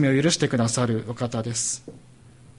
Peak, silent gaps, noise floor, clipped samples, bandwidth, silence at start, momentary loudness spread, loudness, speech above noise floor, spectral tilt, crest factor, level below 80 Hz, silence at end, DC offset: -8 dBFS; none; -49 dBFS; under 0.1%; 11.5 kHz; 0 s; 8 LU; -24 LUFS; 26 dB; -4.5 dB/octave; 18 dB; -56 dBFS; 0.3 s; under 0.1%